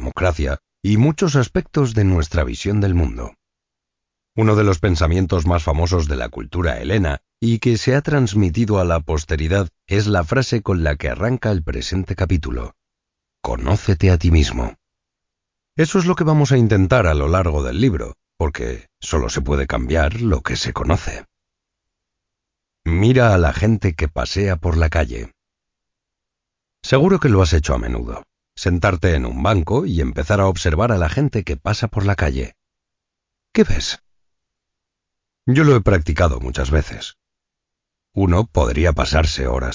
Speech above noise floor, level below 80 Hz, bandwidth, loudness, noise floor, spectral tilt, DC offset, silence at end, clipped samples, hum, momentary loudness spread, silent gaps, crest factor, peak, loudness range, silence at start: 65 dB; -26 dBFS; 7.6 kHz; -18 LUFS; -82 dBFS; -6.5 dB/octave; under 0.1%; 0 s; under 0.1%; none; 12 LU; none; 16 dB; -2 dBFS; 4 LU; 0 s